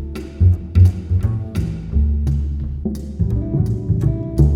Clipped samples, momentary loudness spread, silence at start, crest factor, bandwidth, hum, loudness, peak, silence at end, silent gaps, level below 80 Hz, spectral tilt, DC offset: under 0.1%; 10 LU; 0 s; 16 dB; 10 kHz; none; -19 LUFS; -2 dBFS; 0 s; none; -24 dBFS; -9.5 dB/octave; under 0.1%